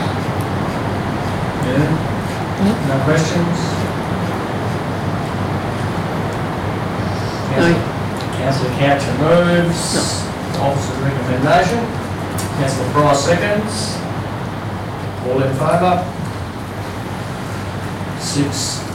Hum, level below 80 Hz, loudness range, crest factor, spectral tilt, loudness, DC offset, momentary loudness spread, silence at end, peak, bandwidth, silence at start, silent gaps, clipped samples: none; -40 dBFS; 4 LU; 14 dB; -5.5 dB/octave; -18 LUFS; under 0.1%; 10 LU; 0 s; -4 dBFS; 16.5 kHz; 0 s; none; under 0.1%